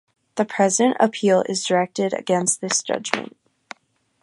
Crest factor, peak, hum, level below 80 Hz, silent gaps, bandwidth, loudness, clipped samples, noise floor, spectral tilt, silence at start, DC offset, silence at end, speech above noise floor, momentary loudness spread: 22 dB; 0 dBFS; none; -70 dBFS; none; 11.5 kHz; -20 LUFS; under 0.1%; -63 dBFS; -3.5 dB/octave; 0.35 s; under 0.1%; 0.95 s; 43 dB; 9 LU